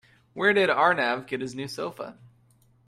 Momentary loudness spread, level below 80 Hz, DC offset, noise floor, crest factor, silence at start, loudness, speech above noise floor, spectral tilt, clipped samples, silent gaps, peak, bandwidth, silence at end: 19 LU; -70 dBFS; under 0.1%; -61 dBFS; 20 dB; 0.35 s; -25 LUFS; 36 dB; -4.5 dB/octave; under 0.1%; none; -6 dBFS; 14 kHz; 0.6 s